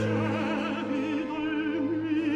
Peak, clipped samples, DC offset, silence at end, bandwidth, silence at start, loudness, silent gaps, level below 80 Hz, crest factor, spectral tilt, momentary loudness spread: -18 dBFS; under 0.1%; under 0.1%; 0 s; 8.6 kHz; 0 s; -29 LUFS; none; -60 dBFS; 12 dB; -7 dB/octave; 2 LU